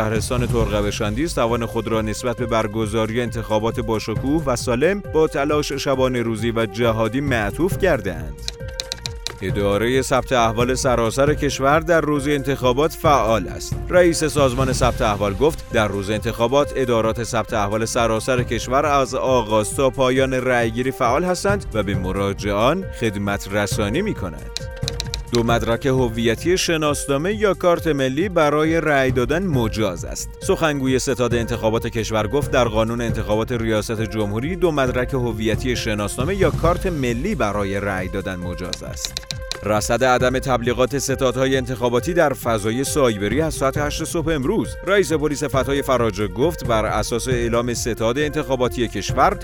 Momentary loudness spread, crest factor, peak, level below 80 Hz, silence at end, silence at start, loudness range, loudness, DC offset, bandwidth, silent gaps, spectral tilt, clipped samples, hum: 6 LU; 18 dB; -2 dBFS; -34 dBFS; 0 s; 0 s; 3 LU; -20 LUFS; under 0.1%; over 20 kHz; none; -5 dB/octave; under 0.1%; none